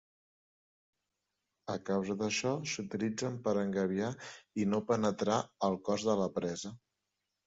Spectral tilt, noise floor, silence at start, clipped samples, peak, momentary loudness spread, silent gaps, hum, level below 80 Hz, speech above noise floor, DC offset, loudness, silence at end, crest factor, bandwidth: -5 dB/octave; -87 dBFS; 1.65 s; under 0.1%; -16 dBFS; 10 LU; none; none; -70 dBFS; 53 dB; under 0.1%; -34 LUFS; 0.7 s; 20 dB; 7.6 kHz